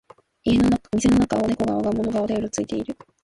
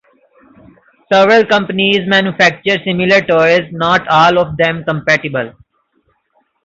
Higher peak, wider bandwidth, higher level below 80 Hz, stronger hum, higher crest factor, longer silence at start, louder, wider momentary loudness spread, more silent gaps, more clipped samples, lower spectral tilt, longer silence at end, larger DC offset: second, -8 dBFS vs 0 dBFS; first, 11.5 kHz vs 7.8 kHz; first, -42 dBFS vs -50 dBFS; neither; about the same, 14 dB vs 14 dB; second, 0.45 s vs 1.1 s; second, -22 LUFS vs -11 LUFS; first, 9 LU vs 6 LU; neither; neither; about the same, -6 dB/octave vs -5 dB/octave; second, 0.3 s vs 1.15 s; neither